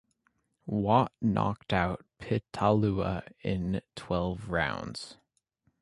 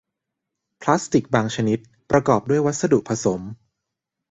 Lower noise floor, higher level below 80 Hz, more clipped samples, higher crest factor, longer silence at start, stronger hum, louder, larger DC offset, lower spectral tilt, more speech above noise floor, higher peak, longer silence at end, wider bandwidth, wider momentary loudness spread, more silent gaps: second, -75 dBFS vs -82 dBFS; about the same, -50 dBFS vs -54 dBFS; neither; about the same, 22 dB vs 20 dB; second, 0.65 s vs 0.8 s; neither; second, -30 LUFS vs -21 LUFS; neither; about the same, -7 dB/octave vs -6 dB/octave; second, 45 dB vs 62 dB; second, -10 dBFS vs -2 dBFS; about the same, 0.7 s vs 0.75 s; first, 11.5 kHz vs 8.2 kHz; first, 12 LU vs 9 LU; neither